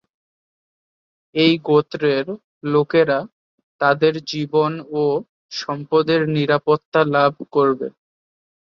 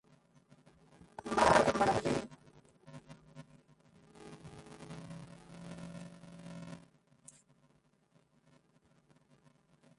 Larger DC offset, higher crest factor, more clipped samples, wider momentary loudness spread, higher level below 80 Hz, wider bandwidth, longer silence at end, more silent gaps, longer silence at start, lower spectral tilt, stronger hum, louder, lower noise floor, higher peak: neither; second, 18 dB vs 26 dB; neither; second, 10 LU vs 29 LU; about the same, -64 dBFS vs -62 dBFS; second, 7 kHz vs 11.5 kHz; second, 0.75 s vs 3.25 s; first, 2.44-2.61 s, 3.32-3.79 s, 5.29-5.49 s, 6.85-6.92 s vs none; about the same, 1.35 s vs 1.25 s; first, -6.5 dB/octave vs -4.5 dB/octave; neither; first, -19 LUFS vs -31 LUFS; first, under -90 dBFS vs -71 dBFS; first, -2 dBFS vs -14 dBFS